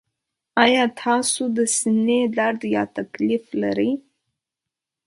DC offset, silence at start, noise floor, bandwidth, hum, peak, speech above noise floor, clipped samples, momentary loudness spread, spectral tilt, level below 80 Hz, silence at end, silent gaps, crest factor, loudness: under 0.1%; 0.55 s; -86 dBFS; 11.5 kHz; none; -2 dBFS; 66 dB; under 0.1%; 8 LU; -3 dB/octave; -66 dBFS; 1.05 s; none; 20 dB; -21 LUFS